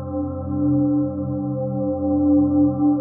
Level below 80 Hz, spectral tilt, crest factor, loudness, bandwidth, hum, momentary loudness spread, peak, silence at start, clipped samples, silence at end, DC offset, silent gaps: -44 dBFS; -17.5 dB/octave; 12 dB; -21 LUFS; 1.4 kHz; none; 8 LU; -8 dBFS; 0 s; under 0.1%; 0 s; under 0.1%; none